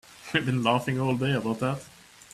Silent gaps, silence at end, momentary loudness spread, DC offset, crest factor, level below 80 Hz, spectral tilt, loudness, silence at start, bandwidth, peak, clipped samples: none; 0.45 s; 5 LU; under 0.1%; 20 dB; -60 dBFS; -6 dB/octave; -27 LUFS; 0.1 s; 14 kHz; -8 dBFS; under 0.1%